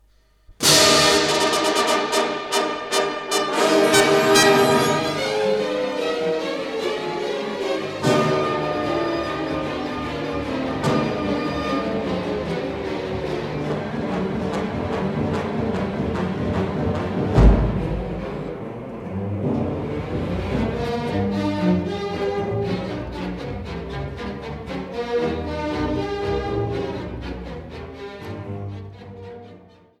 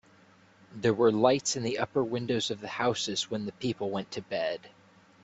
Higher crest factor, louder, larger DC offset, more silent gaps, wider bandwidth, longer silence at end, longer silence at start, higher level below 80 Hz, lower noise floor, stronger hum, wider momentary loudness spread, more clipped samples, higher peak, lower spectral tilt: about the same, 20 dB vs 20 dB; first, -22 LUFS vs -29 LUFS; neither; neither; first, 17.5 kHz vs 8.4 kHz; second, 0.4 s vs 0.55 s; second, 0.5 s vs 0.7 s; first, -34 dBFS vs -68 dBFS; second, -53 dBFS vs -59 dBFS; neither; first, 15 LU vs 9 LU; neither; first, -2 dBFS vs -10 dBFS; about the same, -4 dB/octave vs -4 dB/octave